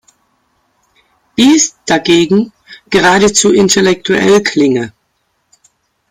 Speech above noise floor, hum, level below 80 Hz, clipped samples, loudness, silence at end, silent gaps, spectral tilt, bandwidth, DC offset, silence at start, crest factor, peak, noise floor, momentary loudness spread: 53 dB; none; -48 dBFS; under 0.1%; -10 LUFS; 1.2 s; none; -3.5 dB/octave; 16 kHz; under 0.1%; 1.4 s; 12 dB; 0 dBFS; -63 dBFS; 8 LU